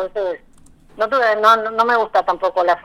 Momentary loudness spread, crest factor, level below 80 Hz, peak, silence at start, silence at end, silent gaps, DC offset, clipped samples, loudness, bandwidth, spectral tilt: 11 LU; 18 dB; -52 dBFS; 0 dBFS; 0 s; 0.05 s; none; under 0.1%; under 0.1%; -17 LUFS; 15.5 kHz; -3 dB/octave